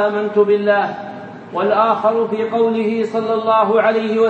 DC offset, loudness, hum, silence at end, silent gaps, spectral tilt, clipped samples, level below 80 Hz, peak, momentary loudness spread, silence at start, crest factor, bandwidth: under 0.1%; -16 LUFS; none; 0 s; none; -7 dB/octave; under 0.1%; -70 dBFS; -2 dBFS; 10 LU; 0 s; 14 dB; 7.6 kHz